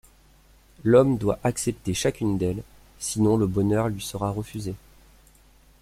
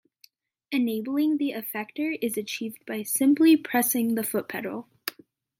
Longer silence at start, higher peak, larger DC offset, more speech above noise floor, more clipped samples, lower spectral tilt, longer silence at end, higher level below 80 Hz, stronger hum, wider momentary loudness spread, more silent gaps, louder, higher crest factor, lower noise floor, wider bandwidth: first, 0.85 s vs 0.7 s; first, -4 dBFS vs -8 dBFS; neither; second, 32 dB vs 36 dB; neither; first, -6 dB/octave vs -3.5 dB/octave; first, 1.05 s vs 0.5 s; first, -48 dBFS vs -80 dBFS; neither; about the same, 15 LU vs 14 LU; neither; about the same, -24 LUFS vs -26 LUFS; about the same, 20 dB vs 18 dB; second, -55 dBFS vs -61 dBFS; about the same, 16 kHz vs 16.5 kHz